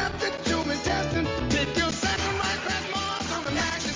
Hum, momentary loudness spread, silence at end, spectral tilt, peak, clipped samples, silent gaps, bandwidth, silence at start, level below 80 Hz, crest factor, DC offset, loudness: none; 3 LU; 0 s; -3.5 dB/octave; -12 dBFS; under 0.1%; none; 7.8 kHz; 0 s; -40 dBFS; 16 dB; under 0.1%; -26 LUFS